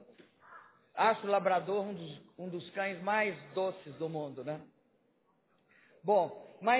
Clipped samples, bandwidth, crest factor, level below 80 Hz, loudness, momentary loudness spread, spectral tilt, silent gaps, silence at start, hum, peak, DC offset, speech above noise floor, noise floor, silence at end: under 0.1%; 4 kHz; 20 dB; -86 dBFS; -34 LUFS; 14 LU; -3.5 dB/octave; none; 0 s; none; -14 dBFS; under 0.1%; 40 dB; -73 dBFS; 0 s